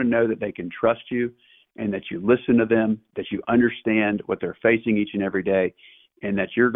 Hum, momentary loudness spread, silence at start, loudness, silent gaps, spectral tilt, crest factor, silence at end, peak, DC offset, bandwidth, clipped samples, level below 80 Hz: none; 10 LU; 0 s; -23 LUFS; none; -10.5 dB/octave; 16 dB; 0 s; -6 dBFS; under 0.1%; 3.8 kHz; under 0.1%; -56 dBFS